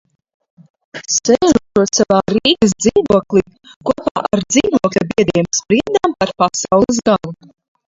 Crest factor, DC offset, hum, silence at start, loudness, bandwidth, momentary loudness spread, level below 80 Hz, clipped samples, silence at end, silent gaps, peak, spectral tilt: 16 dB; under 0.1%; none; 0.95 s; -14 LUFS; 7.8 kHz; 6 LU; -46 dBFS; under 0.1%; 0.55 s; 3.76-3.81 s, 4.11-4.15 s; 0 dBFS; -4 dB/octave